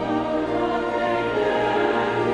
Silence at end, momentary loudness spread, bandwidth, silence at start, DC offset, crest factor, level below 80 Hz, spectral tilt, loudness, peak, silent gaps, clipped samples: 0 s; 3 LU; 10.5 kHz; 0 s; under 0.1%; 14 dB; -48 dBFS; -6 dB/octave; -22 LUFS; -8 dBFS; none; under 0.1%